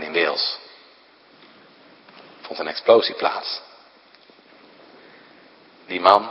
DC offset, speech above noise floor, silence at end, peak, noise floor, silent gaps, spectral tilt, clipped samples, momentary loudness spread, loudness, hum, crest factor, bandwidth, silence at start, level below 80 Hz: under 0.1%; 33 dB; 0 s; 0 dBFS; -52 dBFS; none; -4.5 dB/octave; under 0.1%; 17 LU; -20 LUFS; none; 24 dB; 7.4 kHz; 0 s; -72 dBFS